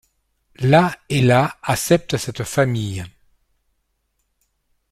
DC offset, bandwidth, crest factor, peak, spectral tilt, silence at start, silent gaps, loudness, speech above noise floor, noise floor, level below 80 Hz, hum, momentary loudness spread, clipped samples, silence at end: under 0.1%; 15.5 kHz; 18 dB; -2 dBFS; -5.5 dB/octave; 0.6 s; none; -18 LUFS; 52 dB; -70 dBFS; -50 dBFS; none; 11 LU; under 0.1%; 1.8 s